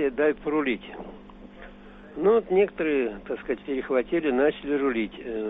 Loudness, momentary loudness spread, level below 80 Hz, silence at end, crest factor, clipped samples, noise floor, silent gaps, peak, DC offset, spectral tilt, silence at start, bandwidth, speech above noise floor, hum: -26 LUFS; 21 LU; -52 dBFS; 0 s; 16 dB; under 0.1%; -46 dBFS; none; -10 dBFS; under 0.1%; -4.5 dB/octave; 0 s; 4 kHz; 20 dB; none